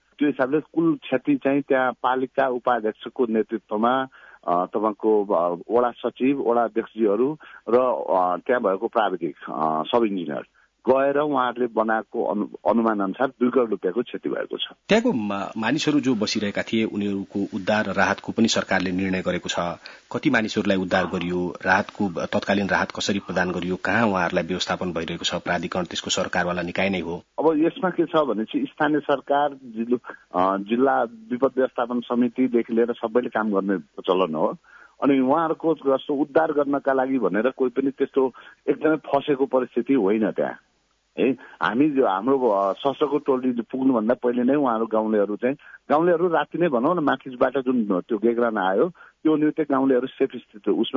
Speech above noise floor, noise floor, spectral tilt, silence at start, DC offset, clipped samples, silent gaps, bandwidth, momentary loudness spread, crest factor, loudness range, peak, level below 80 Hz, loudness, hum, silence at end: 31 dB; -53 dBFS; -5.5 dB/octave; 0.2 s; under 0.1%; under 0.1%; none; 7.8 kHz; 6 LU; 18 dB; 2 LU; -4 dBFS; -64 dBFS; -23 LUFS; none; 0 s